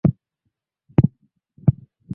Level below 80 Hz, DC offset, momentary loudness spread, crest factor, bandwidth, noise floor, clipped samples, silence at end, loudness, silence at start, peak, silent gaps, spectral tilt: -42 dBFS; under 0.1%; 4 LU; 22 dB; 3.1 kHz; -76 dBFS; under 0.1%; 0 s; -22 LUFS; 0.05 s; -2 dBFS; none; -13 dB/octave